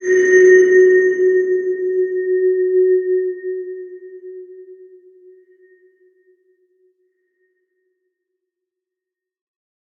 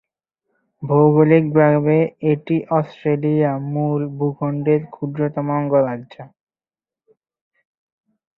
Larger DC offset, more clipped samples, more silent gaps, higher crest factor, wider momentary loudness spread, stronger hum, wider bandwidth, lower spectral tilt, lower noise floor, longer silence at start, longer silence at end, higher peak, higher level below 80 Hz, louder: neither; neither; neither; about the same, 16 dB vs 18 dB; first, 26 LU vs 9 LU; neither; first, 6.8 kHz vs 4.1 kHz; second, -4.5 dB/octave vs -11.5 dB/octave; second, -85 dBFS vs under -90 dBFS; second, 0 s vs 0.8 s; first, 5.25 s vs 2.1 s; about the same, -2 dBFS vs -2 dBFS; second, -80 dBFS vs -60 dBFS; first, -14 LUFS vs -18 LUFS